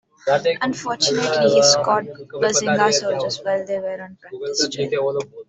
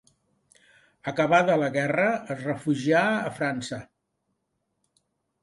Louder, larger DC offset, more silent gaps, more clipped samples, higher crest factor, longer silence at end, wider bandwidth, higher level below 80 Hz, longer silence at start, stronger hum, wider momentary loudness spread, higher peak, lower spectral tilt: first, -19 LUFS vs -25 LUFS; neither; neither; neither; about the same, 18 dB vs 20 dB; second, 0.05 s vs 1.6 s; second, 8.4 kHz vs 11.5 kHz; first, -62 dBFS vs -68 dBFS; second, 0.25 s vs 1.05 s; neither; about the same, 12 LU vs 12 LU; first, -2 dBFS vs -8 dBFS; second, -2.5 dB/octave vs -6 dB/octave